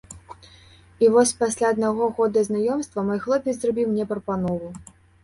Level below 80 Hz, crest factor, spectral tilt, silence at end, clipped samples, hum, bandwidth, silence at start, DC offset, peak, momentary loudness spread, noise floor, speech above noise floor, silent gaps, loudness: -56 dBFS; 18 dB; -5 dB/octave; 0.4 s; under 0.1%; none; 11.5 kHz; 0.1 s; under 0.1%; -6 dBFS; 12 LU; -50 dBFS; 29 dB; none; -22 LUFS